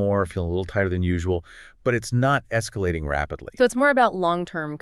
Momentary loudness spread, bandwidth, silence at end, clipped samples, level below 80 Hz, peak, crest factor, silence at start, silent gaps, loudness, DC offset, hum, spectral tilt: 9 LU; 13 kHz; 0.05 s; under 0.1%; -40 dBFS; -6 dBFS; 18 dB; 0 s; none; -23 LUFS; under 0.1%; none; -6 dB/octave